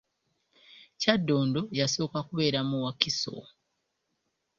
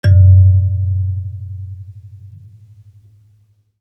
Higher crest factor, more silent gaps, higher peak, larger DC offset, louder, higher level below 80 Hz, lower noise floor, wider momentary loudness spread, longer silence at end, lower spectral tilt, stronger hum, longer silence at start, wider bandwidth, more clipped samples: first, 28 dB vs 14 dB; neither; about the same, -4 dBFS vs -2 dBFS; neither; second, -28 LUFS vs -12 LUFS; second, -66 dBFS vs -46 dBFS; first, -79 dBFS vs -54 dBFS; second, 6 LU vs 24 LU; second, 1.15 s vs 1.55 s; second, -4.5 dB/octave vs -9 dB/octave; neither; first, 0.75 s vs 0.05 s; first, 7.6 kHz vs 5.8 kHz; neither